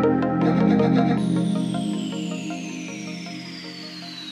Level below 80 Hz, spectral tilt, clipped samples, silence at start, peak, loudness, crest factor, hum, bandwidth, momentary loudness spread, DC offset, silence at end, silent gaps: -58 dBFS; -6.5 dB/octave; under 0.1%; 0 s; -8 dBFS; -23 LUFS; 16 dB; none; 10.5 kHz; 15 LU; under 0.1%; 0 s; none